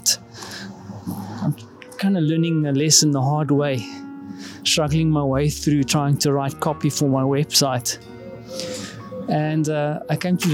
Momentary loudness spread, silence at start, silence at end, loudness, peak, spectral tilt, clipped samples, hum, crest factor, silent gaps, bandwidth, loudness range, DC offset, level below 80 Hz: 17 LU; 0 s; 0 s; -20 LUFS; -2 dBFS; -4.5 dB/octave; under 0.1%; none; 20 dB; none; 17 kHz; 3 LU; under 0.1%; -48 dBFS